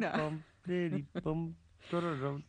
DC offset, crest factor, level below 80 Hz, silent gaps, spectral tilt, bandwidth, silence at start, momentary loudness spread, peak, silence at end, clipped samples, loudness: under 0.1%; 18 dB; -62 dBFS; none; -8 dB/octave; 9.4 kHz; 0 s; 9 LU; -20 dBFS; 0.05 s; under 0.1%; -37 LUFS